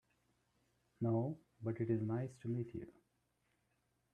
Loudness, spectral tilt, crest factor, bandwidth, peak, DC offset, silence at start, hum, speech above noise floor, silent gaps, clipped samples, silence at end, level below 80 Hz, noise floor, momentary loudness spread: -41 LUFS; -10.5 dB/octave; 18 dB; 9.2 kHz; -24 dBFS; under 0.1%; 1 s; none; 42 dB; none; under 0.1%; 1.25 s; -76 dBFS; -82 dBFS; 10 LU